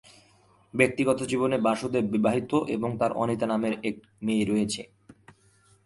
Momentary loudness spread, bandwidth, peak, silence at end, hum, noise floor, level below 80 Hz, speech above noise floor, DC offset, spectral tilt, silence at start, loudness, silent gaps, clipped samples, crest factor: 9 LU; 11.5 kHz; -4 dBFS; 0.75 s; none; -61 dBFS; -62 dBFS; 35 dB; under 0.1%; -5.5 dB/octave; 0.75 s; -27 LUFS; none; under 0.1%; 22 dB